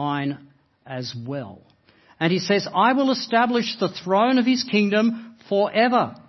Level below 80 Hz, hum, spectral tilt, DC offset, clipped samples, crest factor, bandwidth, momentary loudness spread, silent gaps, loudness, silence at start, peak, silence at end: -70 dBFS; none; -5.5 dB/octave; under 0.1%; under 0.1%; 18 dB; 6.2 kHz; 14 LU; none; -21 LUFS; 0 s; -4 dBFS; 0.1 s